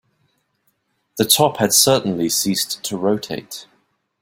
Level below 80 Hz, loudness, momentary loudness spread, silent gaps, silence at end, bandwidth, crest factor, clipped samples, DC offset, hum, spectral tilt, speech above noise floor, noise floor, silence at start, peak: -58 dBFS; -17 LUFS; 18 LU; none; 0.6 s; 16.5 kHz; 20 dB; under 0.1%; under 0.1%; none; -3 dB/octave; 49 dB; -67 dBFS; 1.15 s; 0 dBFS